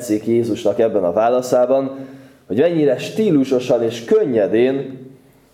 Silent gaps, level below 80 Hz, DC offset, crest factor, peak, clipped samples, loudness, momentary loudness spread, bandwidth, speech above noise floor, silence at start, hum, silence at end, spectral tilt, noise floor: none; -64 dBFS; under 0.1%; 14 dB; -4 dBFS; under 0.1%; -17 LUFS; 10 LU; 16 kHz; 27 dB; 0 s; none; 0.45 s; -6.5 dB/octave; -44 dBFS